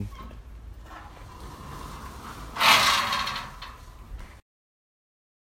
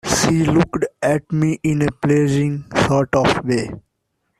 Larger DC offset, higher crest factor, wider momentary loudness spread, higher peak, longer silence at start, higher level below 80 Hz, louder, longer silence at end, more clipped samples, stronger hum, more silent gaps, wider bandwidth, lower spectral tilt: neither; first, 26 dB vs 16 dB; first, 27 LU vs 5 LU; about the same, -4 dBFS vs -2 dBFS; about the same, 0 s vs 0.05 s; about the same, -46 dBFS vs -44 dBFS; second, -21 LUFS vs -18 LUFS; first, 1.05 s vs 0.6 s; neither; neither; neither; first, 16 kHz vs 14 kHz; second, -1.5 dB/octave vs -5.5 dB/octave